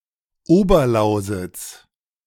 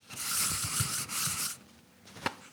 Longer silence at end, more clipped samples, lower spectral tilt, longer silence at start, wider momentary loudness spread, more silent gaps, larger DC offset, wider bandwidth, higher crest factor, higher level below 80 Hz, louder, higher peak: first, 0.5 s vs 0 s; neither; first, -6.5 dB/octave vs -1 dB/octave; first, 0.5 s vs 0.05 s; first, 18 LU vs 10 LU; neither; neither; second, 17.5 kHz vs over 20 kHz; second, 16 dB vs 22 dB; first, -34 dBFS vs -60 dBFS; first, -18 LUFS vs -31 LUFS; first, -2 dBFS vs -14 dBFS